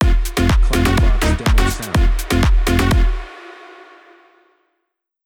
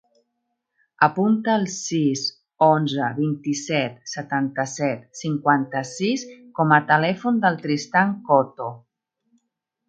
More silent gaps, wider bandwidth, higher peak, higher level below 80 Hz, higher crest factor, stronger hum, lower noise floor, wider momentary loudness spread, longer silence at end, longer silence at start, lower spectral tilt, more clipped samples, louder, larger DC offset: neither; first, 17.5 kHz vs 9.2 kHz; about the same, -2 dBFS vs 0 dBFS; first, -18 dBFS vs -70 dBFS; second, 14 dB vs 22 dB; neither; second, -73 dBFS vs -77 dBFS; first, 16 LU vs 10 LU; first, 1.75 s vs 1.1 s; second, 0 s vs 1 s; about the same, -5.5 dB/octave vs -5 dB/octave; neither; first, -17 LUFS vs -21 LUFS; neither